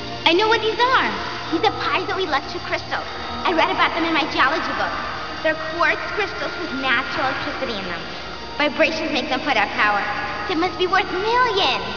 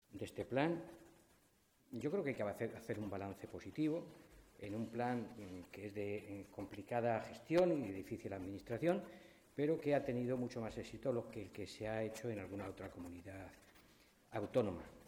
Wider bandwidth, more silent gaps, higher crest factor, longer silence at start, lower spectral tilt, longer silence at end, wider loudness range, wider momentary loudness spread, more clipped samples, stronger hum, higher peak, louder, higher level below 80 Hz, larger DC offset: second, 5.4 kHz vs 16.5 kHz; neither; about the same, 18 dB vs 20 dB; about the same, 0 s vs 0.1 s; second, -4 dB/octave vs -7 dB/octave; about the same, 0 s vs 0 s; second, 2 LU vs 6 LU; second, 9 LU vs 14 LU; neither; first, 60 Hz at -50 dBFS vs none; first, -4 dBFS vs -24 dBFS; first, -20 LUFS vs -43 LUFS; first, -46 dBFS vs -70 dBFS; first, 1% vs under 0.1%